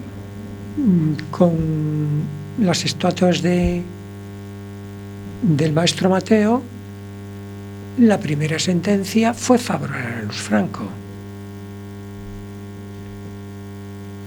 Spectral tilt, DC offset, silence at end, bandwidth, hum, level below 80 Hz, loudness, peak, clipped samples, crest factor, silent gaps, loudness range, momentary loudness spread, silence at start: -6 dB/octave; under 0.1%; 0 s; 19 kHz; 50 Hz at -35 dBFS; -44 dBFS; -19 LUFS; 0 dBFS; under 0.1%; 20 dB; none; 8 LU; 18 LU; 0 s